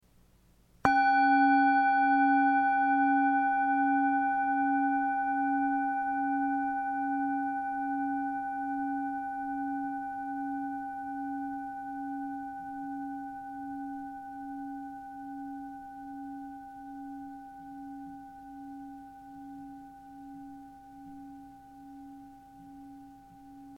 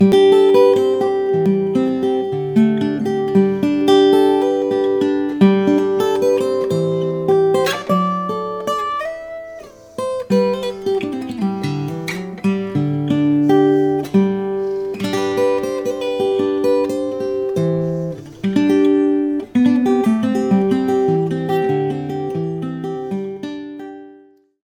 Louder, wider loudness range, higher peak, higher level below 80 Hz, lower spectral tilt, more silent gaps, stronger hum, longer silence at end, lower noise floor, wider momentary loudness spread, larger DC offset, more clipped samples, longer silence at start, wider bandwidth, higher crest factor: second, -30 LUFS vs -17 LUFS; first, 22 LU vs 6 LU; second, -8 dBFS vs 0 dBFS; second, -66 dBFS vs -56 dBFS; second, -5.5 dB/octave vs -7 dB/octave; neither; neither; second, 0 s vs 0.5 s; first, -63 dBFS vs -48 dBFS; first, 24 LU vs 11 LU; neither; neither; first, 0.85 s vs 0 s; second, 6 kHz vs 17 kHz; first, 24 dB vs 16 dB